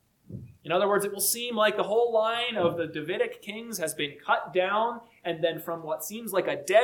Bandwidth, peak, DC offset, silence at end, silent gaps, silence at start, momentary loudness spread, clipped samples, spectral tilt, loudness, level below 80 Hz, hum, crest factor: 19 kHz; -10 dBFS; under 0.1%; 0 s; none; 0.3 s; 11 LU; under 0.1%; -3 dB/octave; -28 LUFS; -70 dBFS; none; 18 dB